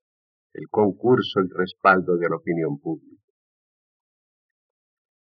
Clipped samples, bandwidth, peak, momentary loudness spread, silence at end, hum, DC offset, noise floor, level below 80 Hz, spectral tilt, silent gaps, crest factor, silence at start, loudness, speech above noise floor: under 0.1%; 6 kHz; -4 dBFS; 13 LU; 2.25 s; none; under 0.1%; under -90 dBFS; -76 dBFS; -4.5 dB/octave; none; 22 dB; 0.55 s; -22 LUFS; over 68 dB